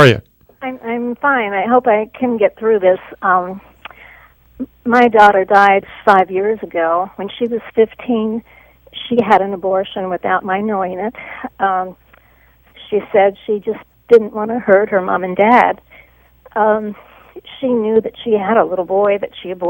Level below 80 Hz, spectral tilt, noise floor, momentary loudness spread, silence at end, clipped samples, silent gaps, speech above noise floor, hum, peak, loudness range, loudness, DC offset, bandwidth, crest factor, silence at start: -52 dBFS; -7 dB/octave; -50 dBFS; 15 LU; 0 s; 0.2%; none; 35 dB; none; 0 dBFS; 6 LU; -15 LUFS; under 0.1%; 16.5 kHz; 16 dB; 0 s